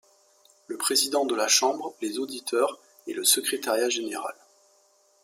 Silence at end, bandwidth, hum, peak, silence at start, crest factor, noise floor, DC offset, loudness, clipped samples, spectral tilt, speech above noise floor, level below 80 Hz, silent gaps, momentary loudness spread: 0.9 s; 16.5 kHz; none; -8 dBFS; 0.7 s; 20 dB; -63 dBFS; under 0.1%; -25 LUFS; under 0.1%; 0 dB/octave; 37 dB; -82 dBFS; none; 14 LU